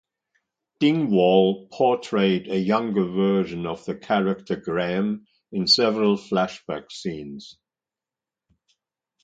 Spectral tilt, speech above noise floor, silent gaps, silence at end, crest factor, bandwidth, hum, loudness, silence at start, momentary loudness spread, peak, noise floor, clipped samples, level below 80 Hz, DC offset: -6 dB/octave; over 68 dB; none; 1.7 s; 18 dB; 9.2 kHz; none; -22 LUFS; 0.8 s; 14 LU; -4 dBFS; under -90 dBFS; under 0.1%; -62 dBFS; under 0.1%